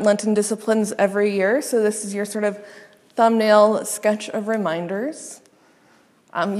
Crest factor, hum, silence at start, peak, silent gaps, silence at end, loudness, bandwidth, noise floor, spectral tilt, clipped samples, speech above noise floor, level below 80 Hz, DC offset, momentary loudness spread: 20 dB; none; 0 s; -2 dBFS; none; 0 s; -20 LUFS; 14 kHz; -56 dBFS; -4.5 dB/octave; under 0.1%; 36 dB; -78 dBFS; under 0.1%; 14 LU